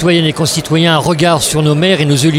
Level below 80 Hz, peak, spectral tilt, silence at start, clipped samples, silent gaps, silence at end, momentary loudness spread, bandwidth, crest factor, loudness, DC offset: -40 dBFS; 0 dBFS; -4.5 dB/octave; 0 s; under 0.1%; none; 0 s; 2 LU; 16.5 kHz; 10 dB; -11 LUFS; under 0.1%